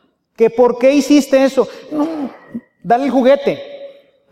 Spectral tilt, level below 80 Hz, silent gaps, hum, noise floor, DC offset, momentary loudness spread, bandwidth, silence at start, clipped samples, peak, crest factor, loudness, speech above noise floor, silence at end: -5 dB/octave; -58 dBFS; none; none; -38 dBFS; under 0.1%; 20 LU; 15 kHz; 0.4 s; under 0.1%; 0 dBFS; 14 dB; -14 LUFS; 24 dB; 0.4 s